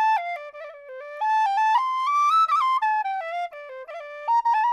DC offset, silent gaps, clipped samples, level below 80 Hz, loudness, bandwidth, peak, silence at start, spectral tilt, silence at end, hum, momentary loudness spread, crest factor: under 0.1%; none; under 0.1%; -76 dBFS; -22 LUFS; 12.5 kHz; -12 dBFS; 0 s; 2.5 dB/octave; 0 s; none; 19 LU; 12 dB